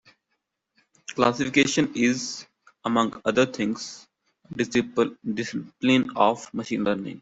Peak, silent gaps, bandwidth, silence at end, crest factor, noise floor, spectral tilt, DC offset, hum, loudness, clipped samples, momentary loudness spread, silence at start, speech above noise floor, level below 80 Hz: -4 dBFS; none; 8 kHz; 0 s; 22 dB; -78 dBFS; -4.5 dB/octave; under 0.1%; none; -24 LUFS; under 0.1%; 13 LU; 1.1 s; 54 dB; -64 dBFS